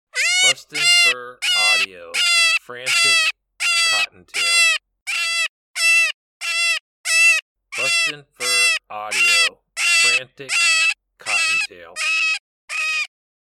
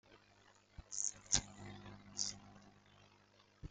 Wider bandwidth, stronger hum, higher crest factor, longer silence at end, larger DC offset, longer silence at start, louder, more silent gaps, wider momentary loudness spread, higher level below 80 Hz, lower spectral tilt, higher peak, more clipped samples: first, 18 kHz vs 10 kHz; second, none vs 50 Hz at -60 dBFS; second, 16 dB vs 36 dB; first, 0.5 s vs 0 s; neither; about the same, 0.15 s vs 0.1 s; first, -16 LUFS vs -41 LUFS; first, 5.02-5.06 s, 5.49-5.74 s, 6.14-6.40 s, 6.80-7.04 s, 7.42-7.55 s, 12.40-12.68 s vs none; second, 10 LU vs 25 LU; second, -72 dBFS vs -64 dBFS; second, 2.5 dB/octave vs -1 dB/octave; first, -4 dBFS vs -12 dBFS; neither